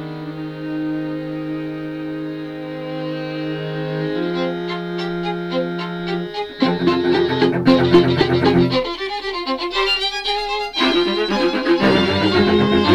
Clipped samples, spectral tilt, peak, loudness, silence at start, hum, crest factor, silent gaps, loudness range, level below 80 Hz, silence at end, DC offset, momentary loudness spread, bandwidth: under 0.1%; -6.5 dB/octave; 0 dBFS; -19 LUFS; 0 s; none; 18 dB; none; 9 LU; -44 dBFS; 0 s; under 0.1%; 12 LU; 11 kHz